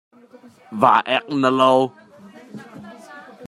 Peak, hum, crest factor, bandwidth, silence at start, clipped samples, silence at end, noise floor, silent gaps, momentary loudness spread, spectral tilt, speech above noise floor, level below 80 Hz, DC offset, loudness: -2 dBFS; none; 20 dB; 12 kHz; 0.7 s; under 0.1%; 0 s; -44 dBFS; none; 25 LU; -5.5 dB/octave; 26 dB; -68 dBFS; under 0.1%; -17 LUFS